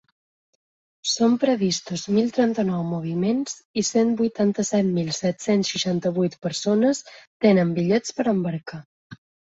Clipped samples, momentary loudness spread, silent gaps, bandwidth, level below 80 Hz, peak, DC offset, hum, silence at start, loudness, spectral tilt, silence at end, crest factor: under 0.1%; 7 LU; 3.65-3.74 s, 7.27-7.40 s, 8.85-9.10 s; 8 kHz; -64 dBFS; -4 dBFS; under 0.1%; none; 1.05 s; -22 LUFS; -5 dB/octave; 0.4 s; 18 dB